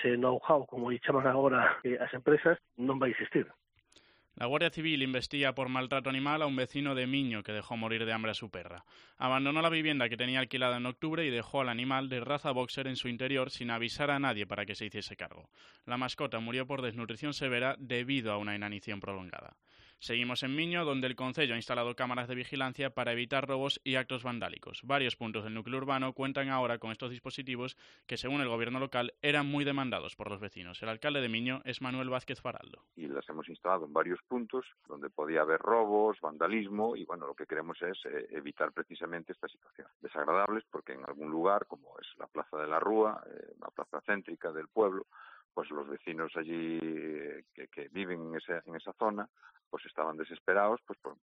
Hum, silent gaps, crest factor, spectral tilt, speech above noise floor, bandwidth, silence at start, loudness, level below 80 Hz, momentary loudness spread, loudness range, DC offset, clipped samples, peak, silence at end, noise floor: none; 39.95-40.00 s, 45.45-45.49 s, 49.66-49.71 s, 50.40-50.46 s; 22 dB; -5.5 dB/octave; 31 dB; 10 kHz; 0 s; -34 LUFS; -70 dBFS; 14 LU; 5 LU; under 0.1%; under 0.1%; -12 dBFS; 0.1 s; -66 dBFS